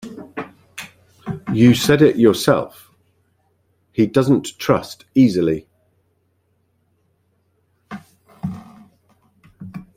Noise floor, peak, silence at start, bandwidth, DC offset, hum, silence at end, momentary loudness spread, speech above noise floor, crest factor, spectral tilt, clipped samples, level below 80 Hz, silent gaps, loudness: -65 dBFS; -2 dBFS; 0.05 s; 16 kHz; under 0.1%; none; 0.15 s; 24 LU; 50 dB; 18 dB; -6 dB/octave; under 0.1%; -54 dBFS; none; -17 LUFS